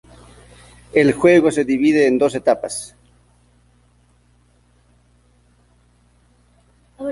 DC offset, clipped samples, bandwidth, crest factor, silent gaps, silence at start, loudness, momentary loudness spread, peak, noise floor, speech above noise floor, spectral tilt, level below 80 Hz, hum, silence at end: under 0.1%; under 0.1%; 11.5 kHz; 18 dB; none; 0.95 s; -16 LUFS; 16 LU; -2 dBFS; -56 dBFS; 41 dB; -5.5 dB/octave; -54 dBFS; 60 Hz at -50 dBFS; 0 s